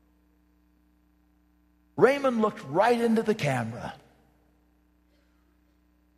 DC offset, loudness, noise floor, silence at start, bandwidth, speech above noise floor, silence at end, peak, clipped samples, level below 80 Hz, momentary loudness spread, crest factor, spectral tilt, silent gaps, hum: under 0.1%; -25 LUFS; -65 dBFS; 1.95 s; 14.5 kHz; 40 dB; 2.25 s; -4 dBFS; under 0.1%; -66 dBFS; 16 LU; 24 dB; -6 dB/octave; none; none